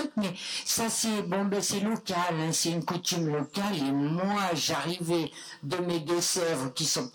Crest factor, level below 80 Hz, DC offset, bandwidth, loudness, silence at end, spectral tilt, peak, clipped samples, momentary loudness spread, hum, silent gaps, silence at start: 10 dB; -68 dBFS; under 0.1%; 19 kHz; -29 LUFS; 0.05 s; -3.5 dB/octave; -18 dBFS; under 0.1%; 5 LU; none; none; 0 s